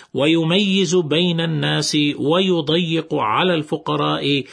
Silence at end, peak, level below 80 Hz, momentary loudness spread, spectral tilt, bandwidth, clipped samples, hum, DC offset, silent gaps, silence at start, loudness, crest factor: 0 s; -4 dBFS; -62 dBFS; 4 LU; -5 dB/octave; 11 kHz; under 0.1%; none; under 0.1%; none; 0.15 s; -18 LUFS; 14 dB